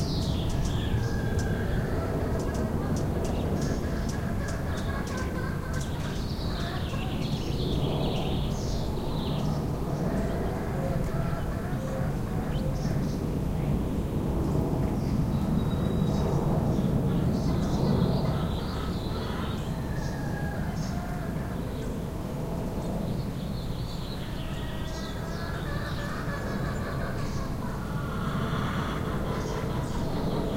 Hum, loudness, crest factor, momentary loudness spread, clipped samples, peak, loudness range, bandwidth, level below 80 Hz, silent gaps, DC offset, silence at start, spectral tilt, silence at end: none; -30 LUFS; 16 dB; 6 LU; under 0.1%; -14 dBFS; 6 LU; 16 kHz; -36 dBFS; none; under 0.1%; 0 s; -7 dB/octave; 0 s